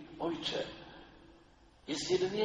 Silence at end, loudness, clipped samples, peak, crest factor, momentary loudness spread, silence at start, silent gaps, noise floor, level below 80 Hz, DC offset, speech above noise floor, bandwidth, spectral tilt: 0 s; -36 LUFS; under 0.1%; -18 dBFS; 20 dB; 21 LU; 0 s; none; -62 dBFS; -64 dBFS; under 0.1%; 28 dB; 9.6 kHz; -4 dB/octave